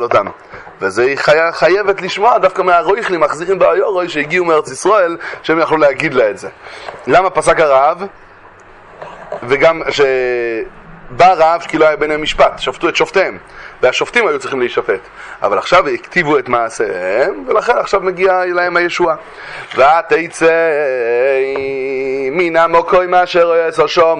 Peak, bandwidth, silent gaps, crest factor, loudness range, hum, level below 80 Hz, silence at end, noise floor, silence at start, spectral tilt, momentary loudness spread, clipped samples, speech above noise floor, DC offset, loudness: 0 dBFS; 11 kHz; none; 14 dB; 2 LU; none; -46 dBFS; 0 s; -39 dBFS; 0 s; -4 dB/octave; 12 LU; under 0.1%; 27 dB; under 0.1%; -13 LUFS